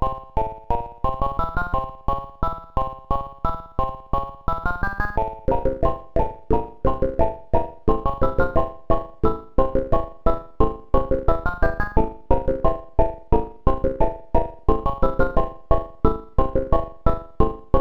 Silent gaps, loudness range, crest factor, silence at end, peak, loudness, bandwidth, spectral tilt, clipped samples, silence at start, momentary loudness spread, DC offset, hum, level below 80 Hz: none; 3 LU; 20 dB; 0 s; 0 dBFS; -25 LUFS; 4.4 kHz; -9.5 dB/octave; under 0.1%; 0 s; 6 LU; under 0.1%; none; -26 dBFS